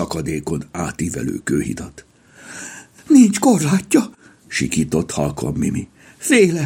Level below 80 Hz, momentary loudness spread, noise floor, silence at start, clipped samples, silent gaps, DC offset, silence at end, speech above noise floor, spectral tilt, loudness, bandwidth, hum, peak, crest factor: -46 dBFS; 20 LU; -40 dBFS; 0 s; under 0.1%; none; under 0.1%; 0 s; 23 dB; -5 dB/octave; -18 LUFS; 17 kHz; none; -2 dBFS; 18 dB